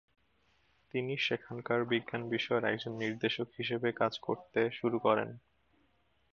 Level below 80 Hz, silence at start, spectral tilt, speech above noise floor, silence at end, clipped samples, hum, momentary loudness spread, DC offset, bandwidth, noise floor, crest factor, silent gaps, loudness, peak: -76 dBFS; 0.95 s; -6 dB/octave; 40 dB; 0.95 s; under 0.1%; none; 6 LU; under 0.1%; 7.2 kHz; -74 dBFS; 20 dB; none; -34 LUFS; -14 dBFS